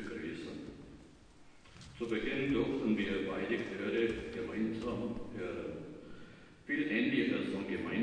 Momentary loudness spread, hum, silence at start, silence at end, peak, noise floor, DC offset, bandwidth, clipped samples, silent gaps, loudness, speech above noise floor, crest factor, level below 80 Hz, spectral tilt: 21 LU; none; 0 s; 0 s; -20 dBFS; -58 dBFS; under 0.1%; 10 kHz; under 0.1%; none; -36 LUFS; 23 dB; 18 dB; -58 dBFS; -6.5 dB/octave